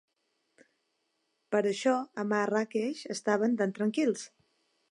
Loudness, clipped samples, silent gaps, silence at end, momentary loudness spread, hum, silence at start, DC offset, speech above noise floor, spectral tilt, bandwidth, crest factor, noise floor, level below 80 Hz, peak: -30 LUFS; under 0.1%; none; 0.65 s; 7 LU; none; 1.5 s; under 0.1%; 49 dB; -5 dB/octave; 11.5 kHz; 18 dB; -78 dBFS; -86 dBFS; -12 dBFS